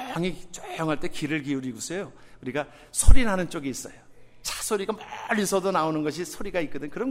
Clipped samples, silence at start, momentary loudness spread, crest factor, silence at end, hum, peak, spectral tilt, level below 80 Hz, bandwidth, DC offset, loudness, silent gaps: under 0.1%; 0 s; 11 LU; 22 dB; 0 s; none; 0 dBFS; -4.5 dB/octave; -30 dBFS; 15 kHz; under 0.1%; -28 LUFS; none